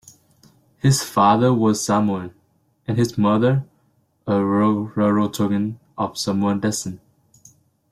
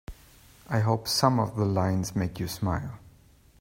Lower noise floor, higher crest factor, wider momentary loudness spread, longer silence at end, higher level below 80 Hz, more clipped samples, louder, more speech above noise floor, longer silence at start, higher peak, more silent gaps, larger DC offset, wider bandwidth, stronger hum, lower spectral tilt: first, -63 dBFS vs -57 dBFS; about the same, 18 dB vs 22 dB; about the same, 12 LU vs 13 LU; first, 0.95 s vs 0.5 s; about the same, -56 dBFS vs -52 dBFS; neither; first, -20 LUFS vs -27 LUFS; first, 44 dB vs 31 dB; first, 0.85 s vs 0.1 s; about the same, -4 dBFS vs -6 dBFS; neither; neither; about the same, 15 kHz vs 16 kHz; neither; about the same, -6 dB/octave vs -5.5 dB/octave